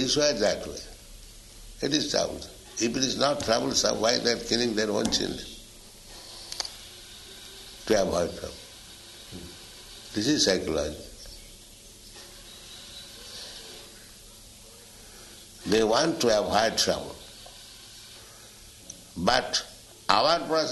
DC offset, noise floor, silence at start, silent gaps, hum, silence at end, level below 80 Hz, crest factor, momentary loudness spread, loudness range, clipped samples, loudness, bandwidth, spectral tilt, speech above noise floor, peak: under 0.1%; -49 dBFS; 0 s; none; none; 0 s; -52 dBFS; 28 dB; 23 LU; 17 LU; under 0.1%; -26 LUFS; 12 kHz; -3 dB/octave; 23 dB; 0 dBFS